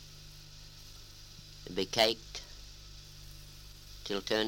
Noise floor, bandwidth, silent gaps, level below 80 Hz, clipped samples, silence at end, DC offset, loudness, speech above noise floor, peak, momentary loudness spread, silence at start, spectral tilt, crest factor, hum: -51 dBFS; 17 kHz; none; -54 dBFS; under 0.1%; 0 s; under 0.1%; -33 LUFS; 19 dB; -12 dBFS; 22 LU; 0 s; -3 dB/octave; 26 dB; 50 Hz at -55 dBFS